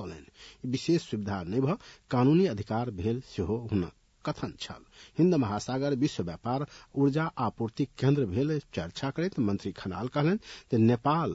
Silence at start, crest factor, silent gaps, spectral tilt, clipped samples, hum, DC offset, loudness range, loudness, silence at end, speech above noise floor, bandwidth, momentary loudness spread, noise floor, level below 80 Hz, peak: 0 s; 16 dB; none; -7.5 dB/octave; under 0.1%; none; under 0.1%; 2 LU; -30 LUFS; 0 s; 22 dB; 8 kHz; 12 LU; -51 dBFS; -60 dBFS; -14 dBFS